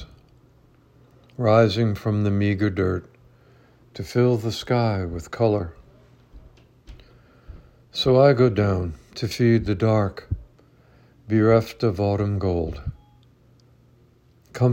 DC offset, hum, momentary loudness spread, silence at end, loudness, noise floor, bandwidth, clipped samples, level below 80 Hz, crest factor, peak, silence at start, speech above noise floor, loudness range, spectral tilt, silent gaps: under 0.1%; none; 16 LU; 0 s; -22 LUFS; -56 dBFS; 16 kHz; under 0.1%; -46 dBFS; 20 dB; -4 dBFS; 0 s; 36 dB; 5 LU; -7.5 dB/octave; none